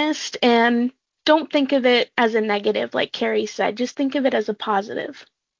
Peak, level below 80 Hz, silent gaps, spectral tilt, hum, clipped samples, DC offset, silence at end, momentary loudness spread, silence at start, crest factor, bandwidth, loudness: -2 dBFS; -70 dBFS; none; -4 dB/octave; none; under 0.1%; under 0.1%; 0.35 s; 7 LU; 0 s; 18 dB; 7.6 kHz; -20 LUFS